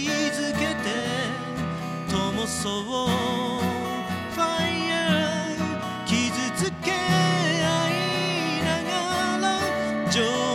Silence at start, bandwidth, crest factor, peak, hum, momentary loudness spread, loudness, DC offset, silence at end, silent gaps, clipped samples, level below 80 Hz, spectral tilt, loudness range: 0 s; 15.5 kHz; 16 dB; -8 dBFS; none; 6 LU; -25 LUFS; under 0.1%; 0 s; none; under 0.1%; -56 dBFS; -4 dB/octave; 3 LU